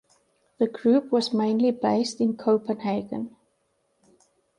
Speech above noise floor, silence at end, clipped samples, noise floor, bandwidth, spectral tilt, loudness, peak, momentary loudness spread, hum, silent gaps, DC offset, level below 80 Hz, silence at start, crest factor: 48 dB; 1.3 s; under 0.1%; -71 dBFS; 11 kHz; -6 dB/octave; -24 LUFS; -10 dBFS; 9 LU; none; none; under 0.1%; -70 dBFS; 0.6 s; 16 dB